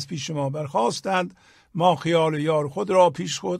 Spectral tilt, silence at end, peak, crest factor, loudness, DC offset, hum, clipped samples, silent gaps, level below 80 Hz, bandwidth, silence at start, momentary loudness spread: -5 dB/octave; 0 s; -4 dBFS; 18 dB; -23 LUFS; under 0.1%; none; under 0.1%; none; -64 dBFS; 13 kHz; 0 s; 9 LU